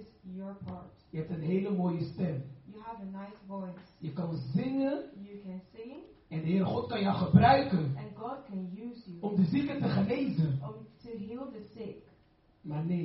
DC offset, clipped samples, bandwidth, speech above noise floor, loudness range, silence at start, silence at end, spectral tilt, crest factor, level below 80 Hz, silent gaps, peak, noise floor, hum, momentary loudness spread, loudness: under 0.1%; under 0.1%; 5.8 kHz; 34 dB; 8 LU; 0 s; 0 s; -7 dB/octave; 24 dB; -62 dBFS; none; -8 dBFS; -65 dBFS; none; 17 LU; -32 LUFS